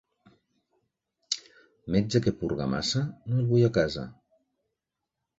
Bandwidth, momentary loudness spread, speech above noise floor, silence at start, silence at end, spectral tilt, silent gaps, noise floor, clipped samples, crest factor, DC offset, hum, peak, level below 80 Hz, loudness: 8 kHz; 11 LU; 59 dB; 1.3 s; 1.25 s; -6 dB/octave; none; -85 dBFS; under 0.1%; 20 dB; under 0.1%; none; -10 dBFS; -54 dBFS; -28 LUFS